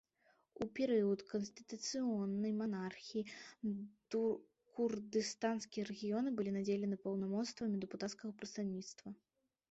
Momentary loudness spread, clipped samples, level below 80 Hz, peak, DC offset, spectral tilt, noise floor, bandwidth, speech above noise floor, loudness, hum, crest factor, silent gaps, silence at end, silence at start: 10 LU; under 0.1%; -80 dBFS; -26 dBFS; under 0.1%; -5.5 dB/octave; -76 dBFS; 8 kHz; 36 dB; -41 LUFS; none; 16 dB; none; 0.55 s; 0.6 s